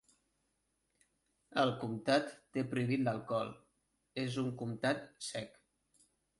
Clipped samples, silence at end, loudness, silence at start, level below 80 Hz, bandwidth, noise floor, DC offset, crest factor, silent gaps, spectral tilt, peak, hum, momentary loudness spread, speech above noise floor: under 0.1%; 0.9 s; -37 LUFS; 1.5 s; -74 dBFS; 11.5 kHz; -82 dBFS; under 0.1%; 20 dB; none; -5.5 dB/octave; -18 dBFS; none; 10 LU; 46 dB